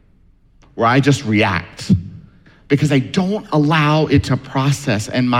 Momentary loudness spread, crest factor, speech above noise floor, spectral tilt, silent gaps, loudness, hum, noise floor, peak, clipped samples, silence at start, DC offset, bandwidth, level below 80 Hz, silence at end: 6 LU; 14 dB; 35 dB; -6 dB/octave; none; -16 LUFS; none; -51 dBFS; -2 dBFS; under 0.1%; 0.75 s; under 0.1%; 13.5 kHz; -44 dBFS; 0 s